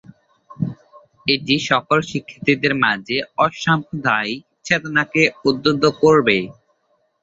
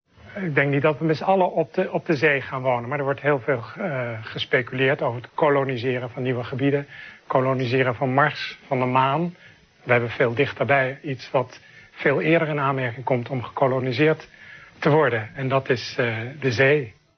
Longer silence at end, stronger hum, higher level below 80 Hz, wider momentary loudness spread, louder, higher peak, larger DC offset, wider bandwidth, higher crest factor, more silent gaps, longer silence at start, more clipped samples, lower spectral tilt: first, 0.7 s vs 0.25 s; neither; about the same, -56 dBFS vs -60 dBFS; first, 12 LU vs 8 LU; first, -18 LUFS vs -22 LUFS; about the same, -2 dBFS vs -4 dBFS; neither; first, 7.8 kHz vs 6.6 kHz; about the same, 18 dB vs 18 dB; neither; first, 0.5 s vs 0.25 s; neither; second, -5 dB/octave vs -7 dB/octave